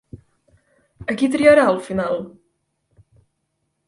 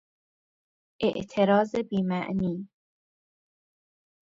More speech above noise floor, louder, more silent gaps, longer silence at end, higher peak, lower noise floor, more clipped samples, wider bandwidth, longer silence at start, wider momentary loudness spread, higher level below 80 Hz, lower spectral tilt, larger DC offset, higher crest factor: second, 56 dB vs over 64 dB; first, -17 LUFS vs -27 LUFS; neither; about the same, 1.6 s vs 1.55 s; first, 0 dBFS vs -10 dBFS; second, -73 dBFS vs under -90 dBFS; neither; first, 11.5 kHz vs 7.6 kHz; second, 0.15 s vs 1 s; first, 16 LU vs 10 LU; first, -54 dBFS vs -62 dBFS; second, -5.5 dB/octave vs -7.5 dB/octave; neither; about the same, 20 dB vs 20 dB